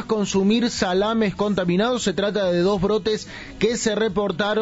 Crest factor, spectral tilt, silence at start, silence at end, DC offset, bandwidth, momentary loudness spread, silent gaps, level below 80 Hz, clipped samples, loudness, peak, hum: 14 dB; -5 dB/octave; 0 s; 0 s; under 0.1%; 8 kHz; 3 LU; none; -46 dBFS; under 0.1%; -21 LUFS; -6 dBFS; none